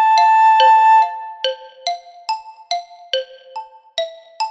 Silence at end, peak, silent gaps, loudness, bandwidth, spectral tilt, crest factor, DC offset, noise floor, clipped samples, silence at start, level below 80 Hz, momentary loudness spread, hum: 0 s; 0 dBFS; none; -16 LUFS; 8 kHz; 2.5 dB/octave; 16 dB; under 0.1%; -34 dBFS; under 0.1%; 0 s; -76 dBFS; 18 LU; none